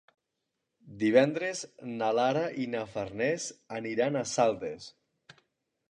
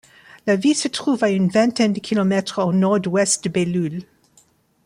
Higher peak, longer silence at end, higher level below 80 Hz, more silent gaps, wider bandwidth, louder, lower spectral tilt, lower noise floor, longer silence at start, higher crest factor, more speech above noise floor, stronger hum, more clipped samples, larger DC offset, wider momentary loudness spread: second, -10 dBFS vs -4 dBFS; first, 1 s vs 0.85 s; second, -70 dBFS vs -62 dBFS; neither; about the same, 10.5 kHz vs 11.5 kHz; second, -30 LUFS vs -19 LUFS; about the same, -4.5 dB/octave vs -5 dB/octave; first, -84 dBFS vs -57 dBFS; first, 0.85 s vs 0.45 s; first, 22 dB vs 16 dB; first, 54 dB vs 39 dB; neither; neither; neither; first, 14 LU vs 5 LU